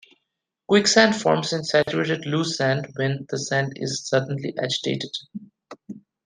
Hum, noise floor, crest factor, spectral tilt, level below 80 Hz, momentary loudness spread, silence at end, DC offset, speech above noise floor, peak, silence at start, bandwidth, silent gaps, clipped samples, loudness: none; -80 dBFS; 22 dB; -4 dB/octave; -64 dBFS; 16 LU; 0.3 s; under 0.1%; 58 dB; -2 dBFS; 0.7 s; 10 kHz; none; under 0.1%; -22 LUFS